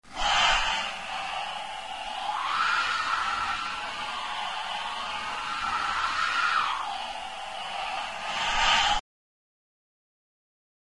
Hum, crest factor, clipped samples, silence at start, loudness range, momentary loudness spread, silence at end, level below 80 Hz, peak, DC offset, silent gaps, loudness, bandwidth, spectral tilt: none; 20 dB; under 0.1%; 0.05 s; 2 LU; 12 LU; 2 s; -48 dBFS; -10 dBFS; 0.3%; none; -28 LUFS; 11.5 kHz; 0 dB/octave